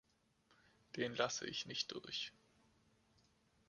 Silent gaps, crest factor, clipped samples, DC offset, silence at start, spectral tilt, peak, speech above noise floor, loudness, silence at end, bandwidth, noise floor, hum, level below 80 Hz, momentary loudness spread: none; 28 dB; under 0.1%; under 0.1%; 0.95 s; -2.5 dB/octave; -20 dBFS; 33 dB; -43 LUFS; 1.4 s; 11 kHz; -77 dBFS; none; -80 dBFS; 7 LU